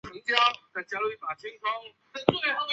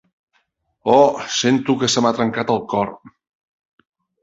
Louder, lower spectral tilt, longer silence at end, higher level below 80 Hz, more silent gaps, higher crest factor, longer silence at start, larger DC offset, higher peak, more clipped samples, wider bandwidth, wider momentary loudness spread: second, -28 LUFS vs -18 LUFS; about the same, -4 dB/octave vs -4 dB/octave; second, 0 s vs 1.15 s; second, -66 dBFS vs -58 dBFS; neither; first, 26 dB vs 18 dB; second, 0.05 s vs 0.85 s; neither; about the same, -2 dBFS vs -2 dBFS; neither; about the same, 8 kHz vs 8 kHz; first, 14 LU vs 9 LU